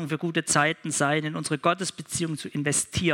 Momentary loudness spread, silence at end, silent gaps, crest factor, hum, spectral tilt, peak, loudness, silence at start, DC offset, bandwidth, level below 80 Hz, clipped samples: 7 LU; 0 s; none; 20 dB; none; -3.5 dB/octave; -6 dBFS; -26 LUFS; 0 s; under 0.1%; 17 kHz; -58 dBFS; under 0.1%